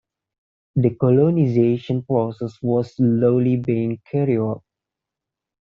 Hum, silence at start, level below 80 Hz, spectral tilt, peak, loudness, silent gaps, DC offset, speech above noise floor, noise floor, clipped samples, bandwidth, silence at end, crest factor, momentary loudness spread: none; 0.75 s; -58 dBFS; -10 dB/octave; -4 dBFS; -20 LUFS; none; under 0.1%; 67 dB; -86 dBFS; under 0.1%; 6.8 kHz; 1.2 s; 16 dB; 9 LU